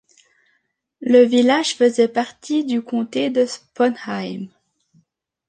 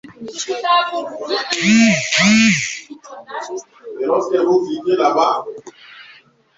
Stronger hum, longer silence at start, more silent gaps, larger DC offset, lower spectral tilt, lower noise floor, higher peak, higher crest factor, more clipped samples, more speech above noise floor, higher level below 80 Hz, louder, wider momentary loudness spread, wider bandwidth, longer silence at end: neither; first, 1 s vs 0.05 s; neither; neither; about the same, -4.5 dB/octave vs -3.5 dB/octave; first, -69 dBFS vs -48 dBFS; about the same, -2 dBFS vs -2 dBFS; about the same, 18 dB vs 16 dB; neither; first, 51 dB vs 31 dB; second, -70 dBFS vs -58 dBFS; second, -19 LUFS vs -16 LUFS; second, 14 LU vs 19 LU; first, 9.6 kHz vs 8 kHz; first, 1 s vs 0.5 s